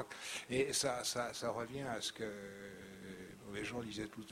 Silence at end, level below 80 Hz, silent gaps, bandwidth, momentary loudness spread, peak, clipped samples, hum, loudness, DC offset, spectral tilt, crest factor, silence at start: 0 s; -68 dBFS; none; 16.5 kHz; 16 LU; -22 dBFS; under 0.1%; none; -40 LUFS; under 0.1%; -3 dB/octave; 20 dB; 0 s